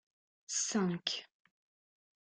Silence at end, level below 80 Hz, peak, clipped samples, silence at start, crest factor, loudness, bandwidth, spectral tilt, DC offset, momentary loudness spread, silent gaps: 0.95 s; -80 dBFS; -16 dBFS; under 0.1%; 0.5 s; 24 dB; -35 LUFS; 10 kHz; -3 dB/octave; under 0.1%; 6 LU; none